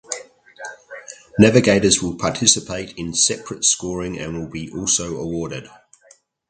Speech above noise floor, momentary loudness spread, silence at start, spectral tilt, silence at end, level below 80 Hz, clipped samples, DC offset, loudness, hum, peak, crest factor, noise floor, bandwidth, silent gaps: 35 dB; 21 LU; 0.1 s; -3 dB/octave; 0.85 s; -46 dBFS; under 0.1%; under 0.1%; -18 LUFS; none; 0 dBFS; 20 dB; -54 dBFS; 9.6 kHz; none